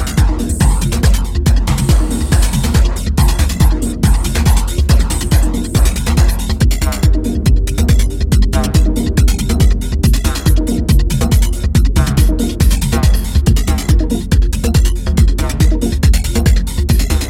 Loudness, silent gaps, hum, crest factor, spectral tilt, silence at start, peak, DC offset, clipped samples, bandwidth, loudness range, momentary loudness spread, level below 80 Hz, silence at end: -14 LUFS; none; none; 10 dB; -5.5 dB/octave; 0 s; 0 dBFS; under 0.1%; under 0.1%; 16.5 kHz; 0 LU; 2 LU; -12 dBFS; 0 s